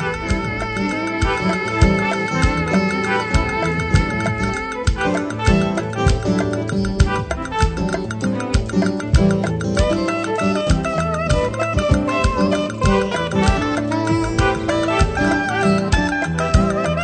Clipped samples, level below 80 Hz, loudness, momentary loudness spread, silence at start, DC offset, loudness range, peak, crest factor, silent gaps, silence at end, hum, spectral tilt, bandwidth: under 0.1%; -26 dBFS; -19 LUFS; 4 LU; 0 s; under 0.1%; 1 LU; 0 dBFS; 18 dB; none; 0 s; none; -6 dB/octave; 9.2 kHz